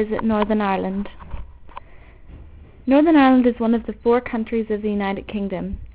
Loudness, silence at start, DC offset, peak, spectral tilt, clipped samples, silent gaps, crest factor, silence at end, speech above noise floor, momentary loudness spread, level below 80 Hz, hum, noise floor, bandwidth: -19 LUFS; 0 s; under 0.1%; -4 dBFS; -11 dB/octave; under 0.1%; none; 16 dB; 0.05 s; 23 dB; 19 LU; -40 dBFS; none; -42 dBFS; 4 kHz